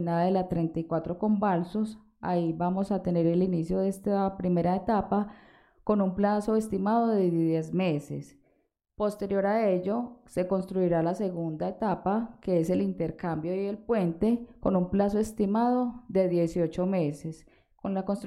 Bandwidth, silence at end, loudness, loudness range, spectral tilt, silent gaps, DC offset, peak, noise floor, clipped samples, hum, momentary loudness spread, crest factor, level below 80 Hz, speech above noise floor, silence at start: 12.5 kHz; 0 s; -28 LUFS; 2 LU; -8.5 dB/octave; none; under 0.1%; -12 dBFS; -73 dBFS; under 0.1%; none; 7 LU; 16 dB; -54 dBFS; 45 dB; 0 s